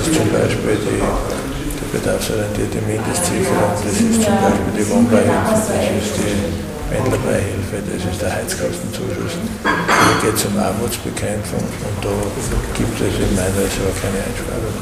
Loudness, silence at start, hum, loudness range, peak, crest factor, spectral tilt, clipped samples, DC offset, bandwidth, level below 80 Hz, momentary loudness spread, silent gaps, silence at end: -18 LUFS; 0 s; none; 4 LU; 0 dBFS; 18 dB; -5 dB/octave; under 0.1%; under 0.1%; 16 kHz; -32 dBFS; 9 LU; none; 0 s